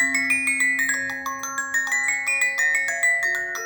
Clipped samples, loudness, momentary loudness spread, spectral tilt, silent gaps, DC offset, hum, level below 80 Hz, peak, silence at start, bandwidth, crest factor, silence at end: under 0.1%; -21 LUFS; 8 LU; 0 dB/octave; none; under 0.1%; none; -64 dBFS; -8 dBFS; 0 s; over 20 kHz; 14 dB; 0 s